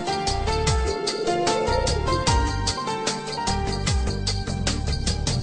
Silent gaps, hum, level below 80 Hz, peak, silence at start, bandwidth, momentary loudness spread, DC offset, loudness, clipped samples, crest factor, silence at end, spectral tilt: none; none; -30 dBFS; -8 dBFS; 0 s; 10 kHz; 4 LU; under 0.1%; -24 LUFS; under 0.1%; 16 dB; 0 s; -4 dB/octave